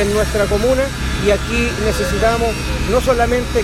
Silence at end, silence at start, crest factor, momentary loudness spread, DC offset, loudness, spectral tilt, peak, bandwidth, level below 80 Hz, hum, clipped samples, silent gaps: 0 s; 0 s; 14 dB; 3 LU; under 0.1%; -16 LUFS; -5 dB/octave; -2 dBFS; 15.5 kHz; -24 dBFS; none; under 0.1%; none